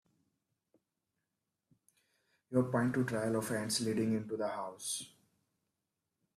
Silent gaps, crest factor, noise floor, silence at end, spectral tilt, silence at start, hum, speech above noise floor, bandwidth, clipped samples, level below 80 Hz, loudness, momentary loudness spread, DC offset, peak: none; 20 dB; -88 dBFS; 1.3 s; -5 dB/octave; 2.5 s; none; 53 dB; 15 kHz; under 0.1%; -76 dBFS; -35 LUFS; 7 LU; under 0.1%; -18 dBFS